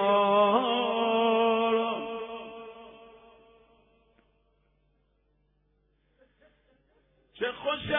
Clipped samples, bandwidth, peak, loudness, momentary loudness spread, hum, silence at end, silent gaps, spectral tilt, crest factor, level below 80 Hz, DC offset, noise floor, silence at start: under 0.1%; 3.8 kHz; -12 dBFS; -26 LUFS; 20 LU; none; 0 s; none; -8 dB/octave; 18 dB; -66 dBFS; under 0.1%; -70 dBFS; 0 s